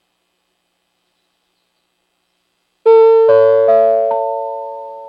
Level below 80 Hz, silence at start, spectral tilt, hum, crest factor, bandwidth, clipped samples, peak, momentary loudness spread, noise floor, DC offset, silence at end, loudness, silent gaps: -82 dBFS; 2.85 s; -7 dB/octave; none; 14 dB; 5.2 kHz; under 0.1%; 0 dBFS; 16 LU; -67 dBFS; under 0.1%; 0 s; -11 LUFS; none